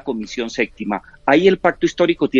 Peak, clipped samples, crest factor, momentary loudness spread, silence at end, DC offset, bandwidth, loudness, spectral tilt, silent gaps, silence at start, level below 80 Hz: 0 dBFS; under 0.1%; 18 dB; 12 LU; 0 s; under 0.1%; 7.6 kHz; -18 LUFS; -5.5 dB/octave; none; 0.05 s; -48 dBFS